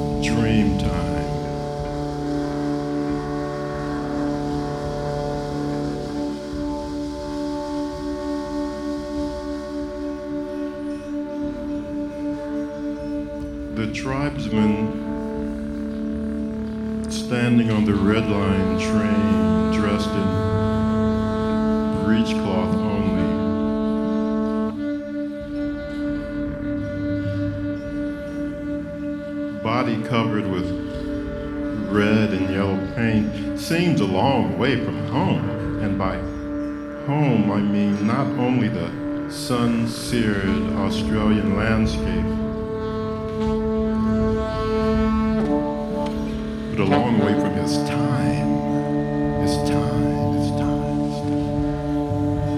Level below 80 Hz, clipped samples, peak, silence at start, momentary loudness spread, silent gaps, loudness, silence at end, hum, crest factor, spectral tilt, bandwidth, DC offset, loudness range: -36 dBFS; under 0.1%; -4 dBFS; 0 s; 9 LU; none; -23 LUFS; 0 s; none; 18 dB; -7 dB/octave; 12.5 kHz; under 0.1%; 7 LU